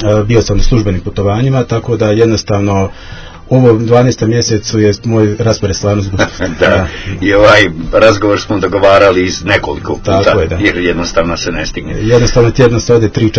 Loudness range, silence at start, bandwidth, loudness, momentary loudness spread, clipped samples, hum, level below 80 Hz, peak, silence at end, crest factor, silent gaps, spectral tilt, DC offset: 3 LU; 0 s; 8 kHz; -10 LUFS; 8 LU; 1%; none; -24 dBFS; 0 dBFS; 0 s; 10 dB; none; -5.5 dB/octave; under 0.1%